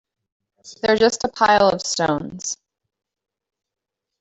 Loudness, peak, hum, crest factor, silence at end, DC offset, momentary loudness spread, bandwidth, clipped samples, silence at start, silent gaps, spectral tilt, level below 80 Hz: -19 LUFS; -2 dBFS; none; 20 dB; 1.65 s; under 0.1%; 13 LU; 8.4 kHz; under 0.1%; 0.65 s; none; -3 dB/octave; -56 dBFS